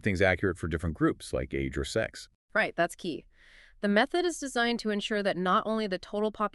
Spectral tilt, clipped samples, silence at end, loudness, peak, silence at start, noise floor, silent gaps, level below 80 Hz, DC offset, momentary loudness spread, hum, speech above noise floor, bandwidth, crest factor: -5 dB/octave; under 0.1%; 0.05 s; -30 LUFS; -10 dBFS; 0.05 s; -57 dBFS; 2.35-2.48 s; -50 dBFS; under 0.1%; 9 LU; none; 27 dB; 12 kHz; 20 dB